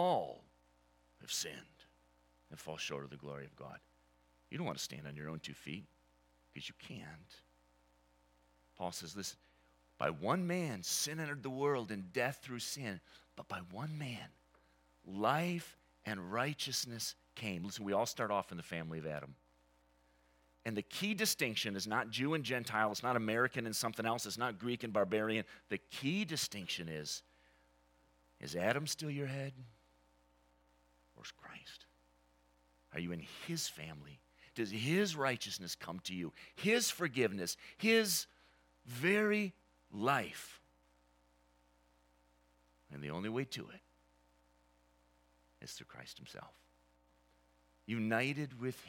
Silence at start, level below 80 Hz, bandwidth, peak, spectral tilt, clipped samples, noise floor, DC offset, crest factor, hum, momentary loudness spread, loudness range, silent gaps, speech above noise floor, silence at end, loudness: 0 s; -76 dBFS; 17.5 kHz; -16 dBFS; -3.5 dB/octave; under 0.1%; -72 dBFS; under 0.1%; 24 dB; 60 Hz at -70 dBFS; 18 LU; 14 LU; none; 33 dB; 0 s; -38 LUFS